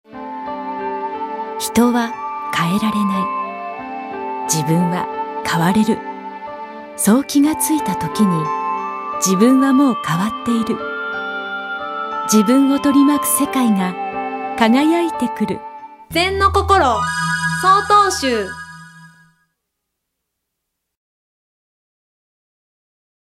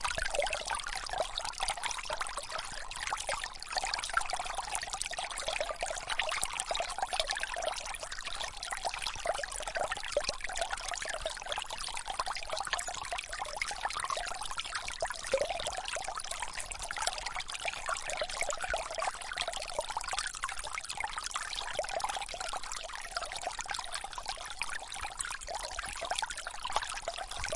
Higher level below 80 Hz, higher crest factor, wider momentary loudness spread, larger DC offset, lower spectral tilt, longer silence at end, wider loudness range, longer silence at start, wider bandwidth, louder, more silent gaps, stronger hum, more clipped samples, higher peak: first, -44 dBFS vs -52 dBFS; second, 18 dB vs 28 dB; first, 14 LU vs 5 LU; neither; first, -4.5 dB/octave vs 0 dB/octave; first, 4.3 s vs 0 s; about the same, 4 LU vs 3 LU; about the same, 0.1 s vs 0 s; first, 16 kHz vs 11.5 kHz; first, -17 LUFS vs -36 LUFS; neither; neither; neither; first, 0 dBFS vs -10 dBFS